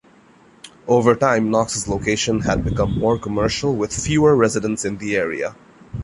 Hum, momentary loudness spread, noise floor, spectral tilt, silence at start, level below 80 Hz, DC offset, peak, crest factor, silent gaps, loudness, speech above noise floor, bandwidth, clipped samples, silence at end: none; 9 LU; -50 dBFS; -5 dB/octave; 0.65 s; -38 dBFS; under 0.1%; -2 dBFS; 18 dB; none; -19 LUFS; 32 dB; 11.5 kHz; under 0.1%; 0 s